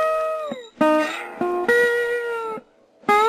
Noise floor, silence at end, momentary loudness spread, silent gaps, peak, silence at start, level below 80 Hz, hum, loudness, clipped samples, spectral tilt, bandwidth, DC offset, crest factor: -48 dBFS; 0 s; 12 LU; none; -6 dBFS; 0 s; -62 dBFS; none; -22 LUFS; under 0.1%; -4 dB/octave; 14 kHz; under 0.1%; 14 dB